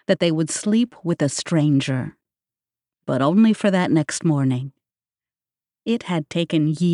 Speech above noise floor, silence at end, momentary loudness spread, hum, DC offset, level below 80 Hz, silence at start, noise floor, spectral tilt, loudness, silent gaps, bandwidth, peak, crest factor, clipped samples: over 71 dB; 0 s; 10 LU; none; under 0.1%; -64 dBFS; 0.1 s; under -90 dBFS; -6 dB/octave; -20 LUFS; none; 11.5 kHz; -6 dBFS; 16 dB; under 0.1%